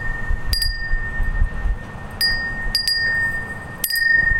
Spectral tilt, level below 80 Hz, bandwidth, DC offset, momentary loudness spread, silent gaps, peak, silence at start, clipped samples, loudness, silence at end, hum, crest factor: -2 dB/octave; -24 dBFS; 16.5 kHz; under 0.1%; 11 LU; none; -2 dBFS; 0 s; under 0.1%; -21 LUFS; 0 s; none; 20 dB